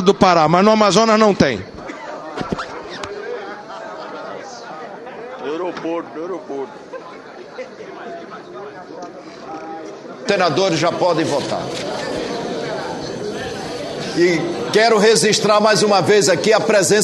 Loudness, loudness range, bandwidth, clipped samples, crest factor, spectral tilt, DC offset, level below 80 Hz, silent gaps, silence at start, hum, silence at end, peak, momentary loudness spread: -16 LUFS; 15 LU; 12.5 kHz; under 0.1%; 18 dB; -4 dB/octave; under 0.1%; -52 dBFS; none; 0 s; none; 0 s; 0 dBFS; 21 LU